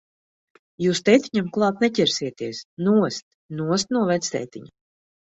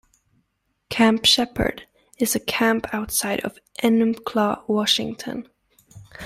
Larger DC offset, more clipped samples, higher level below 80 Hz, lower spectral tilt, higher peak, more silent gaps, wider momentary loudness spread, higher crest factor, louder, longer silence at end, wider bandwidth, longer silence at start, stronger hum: neither; neither; second, -64 dBFS vs -48 dBFS; first, -4.5 dB/octave vs -3 dB/octave; about the same, -4 dBFS vs -4 dBFS; first, 2.65-2.77 s, 3.22-3.49 s vs none; about the same, 14 LU vs 14 LU; about the same, 20 dB vs 18 dB; about the same, -22 LUFS vs -21 LUFS; first, 0.55 s vs 0 s; second, 8 kHz vs 15.5 kHz; about the same, 0.8 s vs 0.9 s; neither